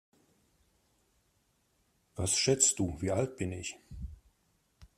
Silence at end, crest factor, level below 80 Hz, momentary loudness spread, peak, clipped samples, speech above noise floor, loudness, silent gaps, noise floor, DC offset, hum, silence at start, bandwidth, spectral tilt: 0.15 s; 26 dB; -56 dBFS; 22 LU; -10 dBFS; under 0.1%; 42 dB; -30 LUFS; none; -74 dBFS; under 0.1%; none; 2.15 s; 14.5 kHz; -3 dB/octave